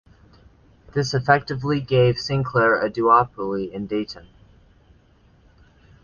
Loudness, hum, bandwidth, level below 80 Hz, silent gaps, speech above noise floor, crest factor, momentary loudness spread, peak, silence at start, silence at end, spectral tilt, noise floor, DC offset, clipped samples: -21 LUFS; none; 7.2 kHz; -50 dBFS; none; 35 dB; 20 dB; 11 LU; -2 dBFS; 0.95 s; 1.85 s; -6.5 dB/octave; -55 dBFS; under 0.1%; under 0.1%